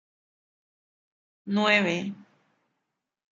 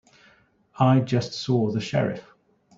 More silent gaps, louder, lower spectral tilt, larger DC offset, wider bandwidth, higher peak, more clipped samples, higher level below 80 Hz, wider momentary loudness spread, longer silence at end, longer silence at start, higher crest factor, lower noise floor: neither; about the same, -24 LUFS vs -24 LUFS; second, -5 dB/octave vs -7 dB/octave; neither; about the same, 7.6 kHz vs 7.6 kHz; about the same, -6 dBFS vs -6 dBFS; neither; second, -78 dBFS vs -60 dBFS; first, 17 LU vs 7 LU; first, 1.1 s vs 0.55 s; first, 1.45 s vs 0.75 s; first, 24 dB vs 18 dB; first, -82 dBFS vs -59 dBFS